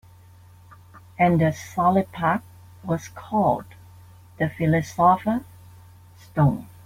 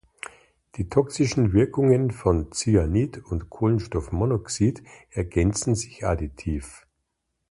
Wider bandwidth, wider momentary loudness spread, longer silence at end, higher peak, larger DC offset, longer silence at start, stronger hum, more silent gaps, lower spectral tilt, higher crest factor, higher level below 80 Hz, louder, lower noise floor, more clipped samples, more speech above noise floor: first, 16 kHz vs 11.5 kHz; second, 10 LU vs 14 LU; second, 0.2 s vs 0.75 s; about the same, -6 dBFS vs -6 dBFS; neither; first, 0.95 s vs 0.75 s; neither; neither; about the same, -7.5 dB/octave vs -6.5 dB/octave; about the same, 18 dB vs 18 dB; second, -54 dBFS vs -38 dBFS; about the same, -23 LUFS vs -24 LUFS; second, -49 dBFS vs -78 dBFS; neither; second, 28 dB vs 55 dB